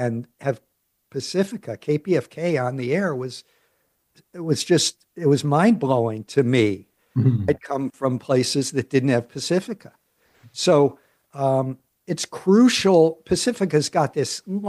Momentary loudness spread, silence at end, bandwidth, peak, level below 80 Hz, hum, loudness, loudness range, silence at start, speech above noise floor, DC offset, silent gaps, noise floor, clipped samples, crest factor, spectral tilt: 13 LU; 0 s; 12.5 kHz; -4 dBFS; -60 dBFS; none; -21 LUFS; 5 LU; 0 s; 48 dB; under 0.1%; none; -68 dBFS; under 0.1%; 18 dB; -5.5 dB/octave